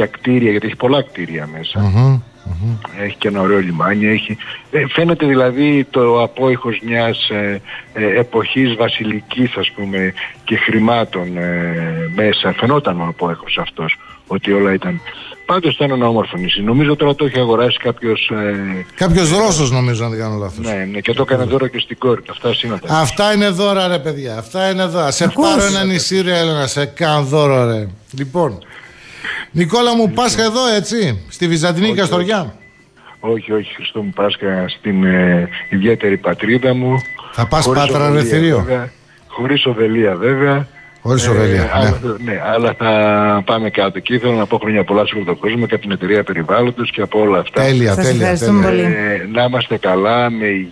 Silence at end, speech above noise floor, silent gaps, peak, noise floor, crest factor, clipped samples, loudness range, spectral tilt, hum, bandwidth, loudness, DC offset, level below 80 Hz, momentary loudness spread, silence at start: 0 s; 28 dB; none; -2 dBFS; -43 dBFS; 14 dB; under 0.1%; 3 LU; -5.5 dB/octave; none; 11 kHz; -15 LUFS; under 0.1%; -40 dBFS; 9 LU; 0 s